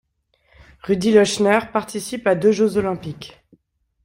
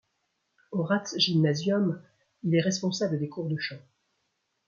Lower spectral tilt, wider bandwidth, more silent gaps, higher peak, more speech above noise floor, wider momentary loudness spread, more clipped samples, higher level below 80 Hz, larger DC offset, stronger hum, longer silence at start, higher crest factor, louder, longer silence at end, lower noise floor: about the same, -5 dB/octave vs -5.5 dB/octave; first, 16 kHz vs 7.4 kHz; neither; first, -2 dBFS vs -10 dBFS; second, 45 dB vs 50 dB; first, 19 LU vs 11 LU; neither; first, -54 dBFS vs -72 dBFS; neither; neither; first, 0.85 s vs 0.7 s; about the same, 18 dB vs 18 dB; first, -19 LUFS vs -28 LUFS; second, 0.75 s vs 0.9 s; second, -63 dBFS vs -77 dBFS